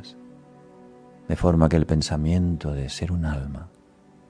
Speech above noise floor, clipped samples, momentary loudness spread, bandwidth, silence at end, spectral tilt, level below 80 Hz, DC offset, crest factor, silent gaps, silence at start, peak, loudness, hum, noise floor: 31 dB; under 0.1%; 17 LU; 10.5 kHz; 0.6 s; -7 dB/octave; -34 dBFS; under 0.1%; 20 dB; none; 0 s; -4 dBFS; -24 LUFS; none; -54 dBFS